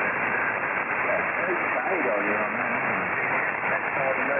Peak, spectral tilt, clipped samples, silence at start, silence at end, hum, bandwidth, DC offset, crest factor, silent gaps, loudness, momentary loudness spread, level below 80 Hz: -12 dBFS; -3.5 dB/octave; under 0.1%; 0 s; 0 s; none; 3.6 kHz; under 0.1%; 12 dB; none; -24 LUFS; 1 LU; -62 dBFS